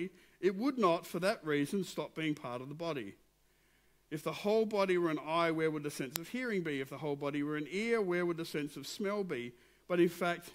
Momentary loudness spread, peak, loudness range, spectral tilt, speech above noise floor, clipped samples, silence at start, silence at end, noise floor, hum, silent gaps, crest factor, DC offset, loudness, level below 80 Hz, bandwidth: 9 LU; -6 dBFS; 4 LU; -5.5 dB/octave; 36 dB; under 0.1%; 0 s; 0 s; -71 dBFS; none; none; 30 dB; under 0.1%; -35 LUFS; -74 dBFS; 16 kHz